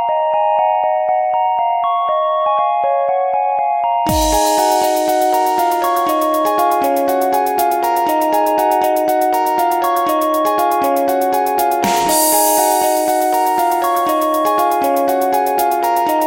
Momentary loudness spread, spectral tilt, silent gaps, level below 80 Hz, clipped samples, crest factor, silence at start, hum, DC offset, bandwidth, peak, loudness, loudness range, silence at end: 3 LU; -3 dB/octave; none; -40 dBFS; under 0.1%; 14 dB; 0 s; none; under 0.1%; 17 kHz; 0 dBFS; -15 LUFS; 1 LU; 0 s